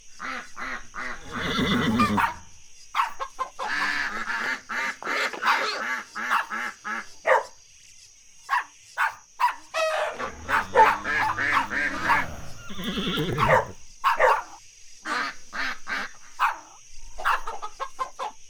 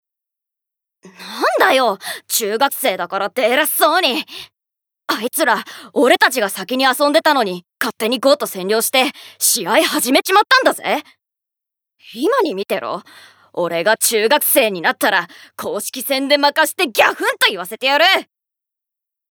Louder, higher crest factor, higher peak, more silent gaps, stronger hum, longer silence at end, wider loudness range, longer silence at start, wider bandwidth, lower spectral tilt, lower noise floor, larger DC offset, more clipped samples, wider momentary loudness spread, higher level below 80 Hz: second, -26 LUFS vs -16 LUFS; first, 22 dB vs 16 dB; second, -4 dBFS vs 0 dBFS; neither; neither; second, 0 s vs 1.1 s; about the same, 5 LU vs 3 LU; second, 0.05 s vs 1.05 s; about the same, over 20 kHz vs over 20 kHz; first, -4 dB/octave vs -1.5 dB/octave; second, -50 dBFS vs -84 dBFS; neither; neither; about the same, 13 LU vs 11 LU; first, -48 dBFS vs -70 dBFS